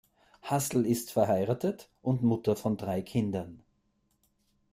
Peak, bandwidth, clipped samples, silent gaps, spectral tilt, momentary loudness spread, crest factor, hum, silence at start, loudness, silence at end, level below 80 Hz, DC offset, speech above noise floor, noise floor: -12 dBFS; 16 kHz; under 0.1%; none; -6.5 dB/octave; 8 LU; 18 dB; none; 0.45 s; -30 LUFS; 1.15 s; -64 dBFS; under 0.1%; 44 dB; -74 dBFS